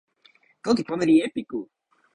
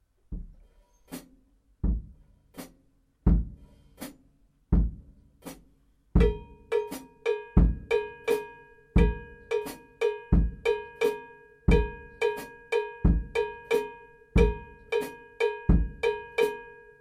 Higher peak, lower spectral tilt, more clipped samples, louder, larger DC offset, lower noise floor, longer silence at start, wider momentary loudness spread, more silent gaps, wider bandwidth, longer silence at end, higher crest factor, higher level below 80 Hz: about the same, -8 dBFS vs -8 dBFS; about the same, -6 dB/octave vs -7 dB/octave; neither; first, -24 LUFS vs -29 LUFS; neither; second, -60 dBFS vs -65 dBFS; first, 0.65 s vs 0.3 s; second, 14 LU vs 20 LU; neither; second, 10.5 kHz vs 15.5 kHz; first, 0.5 s vs 0.3 s; about the same, 18 dB vs 22 dB; second, -62 dBFS vs -32 dBFS